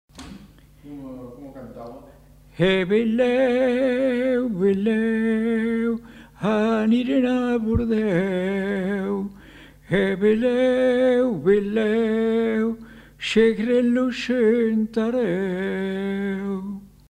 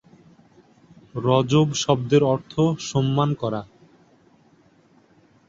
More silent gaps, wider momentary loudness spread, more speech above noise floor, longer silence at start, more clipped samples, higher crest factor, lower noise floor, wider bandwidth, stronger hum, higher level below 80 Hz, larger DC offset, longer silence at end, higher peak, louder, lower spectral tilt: neither; first, 18 LU vs 9 LU; second, 26 dB vs 36 dB; second, 0.15 s vs 1.15 s; neither; about the same, 16 dB vs 20 dB; second, -47 dBFS vs -57 dBFS; first, 10.5 kHz vs 7.8 kHz; neither; first, -48 dBFS vs -58 dBFS; neither; second, 0.25 s vs 1.85 s; about the same, -6 dBFS vs -4 dBFS; about the same, -21 LUFS vs -21 LUFS; about the same, -7 dB/octave vs -6 dB/octave